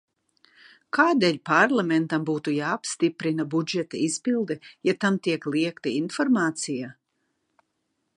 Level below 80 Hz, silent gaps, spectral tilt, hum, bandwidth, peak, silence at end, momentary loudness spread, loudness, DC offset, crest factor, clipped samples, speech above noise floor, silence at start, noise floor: -76 dBFS; none; -4.5 dB/octave; none; 11 kHz; -4 dBFS; 1.25 s; 8 LU; -25 LUFS; under 0.1%; 22 dB; under 0.1%; 52 dB; 0.95 s; -76 dBFS